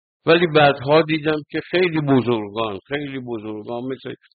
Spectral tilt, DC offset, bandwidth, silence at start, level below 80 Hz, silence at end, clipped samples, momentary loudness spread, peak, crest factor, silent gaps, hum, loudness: -4 dB/octave; under 0.1%; 4.8 kHz; 0.25 s; -56 dBFS; 0.2 s; under 0.1%; 14 LU; -2 dBFS; 16 dB; none; none; -20 LUFS